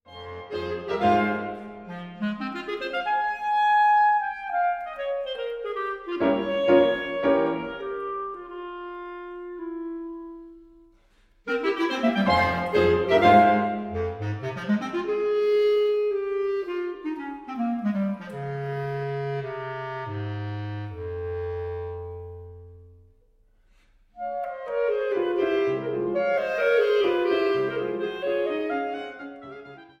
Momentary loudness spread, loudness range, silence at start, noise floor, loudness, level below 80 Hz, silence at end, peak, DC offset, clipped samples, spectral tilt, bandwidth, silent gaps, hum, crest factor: 16 LU; 13 LU; 0.1 s; -60 dBFS; -25 LUFS; -54 dBFS; 0.15 s; -4 dBFS; under 0.1%; under 0.1%; -7 dB/octave; 8.4 kHz; none; none; 22 dB